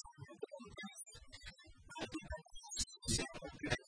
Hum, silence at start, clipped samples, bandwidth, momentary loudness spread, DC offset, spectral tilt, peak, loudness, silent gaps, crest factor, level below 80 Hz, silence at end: none; 0.05 s; under 0.1%; 10.5 kHz; 16 LU; under 0.1%; -3 dB/octave; -22 dBFS; -45 LUFS; none; 24 dB; -58 dBFS; 0 s